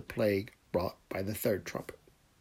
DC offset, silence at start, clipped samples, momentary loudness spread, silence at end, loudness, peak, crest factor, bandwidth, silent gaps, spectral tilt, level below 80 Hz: under 0.1%; 0 s; under 0.1%; 11 LU; 0.5 s; -35 LUFS; -18 dBFS; 18 dB; 16 kHz; none; -5.5 dB/octave; -64 dBFS